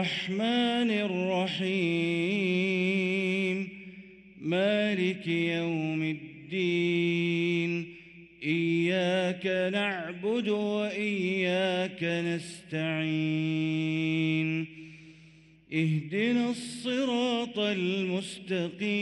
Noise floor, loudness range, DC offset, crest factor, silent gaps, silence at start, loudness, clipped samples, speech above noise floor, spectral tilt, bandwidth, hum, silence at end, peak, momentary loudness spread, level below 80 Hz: -56 dBFS; 2 LU; under 0.1%; 14 dB; none; 0 s; -29 LUFS; under 0.1%; 28 dB; -6 dB/octave; 11.5 kHz; none; 0 s; -16 dBFS; 8 LU; -72 dBFS